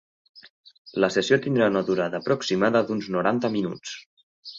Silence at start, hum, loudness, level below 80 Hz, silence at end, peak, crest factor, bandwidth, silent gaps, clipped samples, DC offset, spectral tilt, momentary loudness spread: 0.35 s; none; -24 LUFS; -64 dBFS; 0 s; -6 dBFS; 20 dB; 7.8 kHz; 0.50-0.64 s, 0.78-0.85 s, 4.06-4.17 s, 4.23-4.43 s; under 0.1%; under 0.1%; -5.5 dB/octave; 14 LU